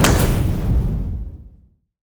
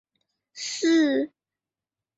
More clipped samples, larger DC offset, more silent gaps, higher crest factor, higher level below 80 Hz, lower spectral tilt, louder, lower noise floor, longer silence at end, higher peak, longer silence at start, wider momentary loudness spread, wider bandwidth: neither; neither; neither; about the same, 14 dB vs 16 dB; first, -24 dBFS vs -76 dBFS; first, -5 dB/octave vs -2 dB/octave; first, -20 LUFS vs -23 LUFS; second, -52 dBFS vs under -90 dBFS; second, 0.65 s vs 0.9 s; first, -4 dBFS vs -12 dBFS; second, 0 s vs 0.55 s; first, 18 LU vs 14 LU; first, over 20 kHz vs 8.2 kHz